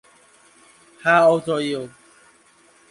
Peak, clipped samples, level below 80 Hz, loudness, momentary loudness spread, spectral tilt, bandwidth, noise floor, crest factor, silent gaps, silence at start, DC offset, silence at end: -2 dBFS; under 0.1%; -68 dBFS; -19 LUFS; 15 LU; -5 dB/octave; 11.5 kHz; -55 dBFS; 20 dB; none; 1.05 s; under 0.1%; 1 s